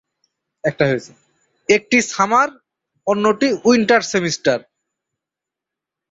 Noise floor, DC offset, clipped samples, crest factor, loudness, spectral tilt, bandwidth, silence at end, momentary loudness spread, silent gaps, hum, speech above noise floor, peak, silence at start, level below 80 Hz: -85 dBFS; under 0.1%; under 0.1%; 18 dB; -17 LUFS; -4 dB/octave; 8 kHz; 1.5 s; 10 LU; none; none; 69 dB; -2 dBFS; 0.65 s; -58 dBFS